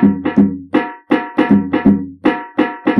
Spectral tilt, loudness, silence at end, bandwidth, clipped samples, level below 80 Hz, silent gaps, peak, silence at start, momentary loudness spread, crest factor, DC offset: -9 dB/octave; -15 LUFS; 0 s; 5.4 kHz; under 0.1%; -48 dBFS; none; -2 dBFS; 0 s; 5 LU; 12 dB; under 0.1%